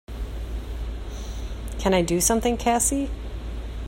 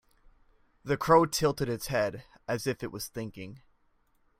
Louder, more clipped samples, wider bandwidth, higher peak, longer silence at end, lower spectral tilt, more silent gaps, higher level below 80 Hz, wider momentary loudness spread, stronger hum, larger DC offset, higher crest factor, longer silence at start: first, -25 LUFS vs -29 LUFS; neither; about the same, 16.5 kHz vs 16 kHz; first, -6 dBFS vs -10 dBFS; second, 0 s vs 0.8 s; about the same, -4 dB/octave vs -5 dB/octave; neither; first, -32 dBFS vs -56 dBFS; second, 14 LU vs 21 LU; neither; neither; about the same, 18 dB vs 22 dB; second, 0.1 s vs 0.85 s